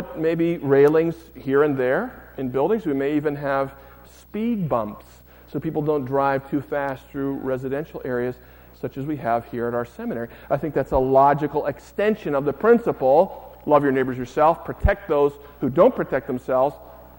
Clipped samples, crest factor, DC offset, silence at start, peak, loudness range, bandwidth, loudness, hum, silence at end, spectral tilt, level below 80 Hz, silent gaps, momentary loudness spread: under 0.1%; 18 dB; under 0.1%; 0 s; -4 dBFS; 7 LU; 16.5 kHz; -22 LUFS; none; 0.15 s; -8.5 dB/octave; -40 dBFS; none; 12 LU